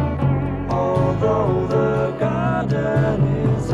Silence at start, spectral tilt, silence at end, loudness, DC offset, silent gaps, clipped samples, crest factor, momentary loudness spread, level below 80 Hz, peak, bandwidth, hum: 0 s; -9 dB/octave; 0 s; -20 LUFS; 0.2%; none; under 0.1%; 12 dB; 3 LU; -36 dBFS; -6 dBFS; 8 kHz; none